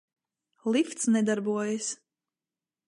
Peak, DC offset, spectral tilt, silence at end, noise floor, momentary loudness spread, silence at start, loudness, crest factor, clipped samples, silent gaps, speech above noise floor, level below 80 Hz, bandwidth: -14 dBFS; under 0.1%; -4 dB/octave; 0.9 s; under -90 dBFS; 10 LU; 0.65 s; -28 LUFS; 16 dB; under 0.1%; none; over 63 dB; -80 dBFS; 11.5 kHz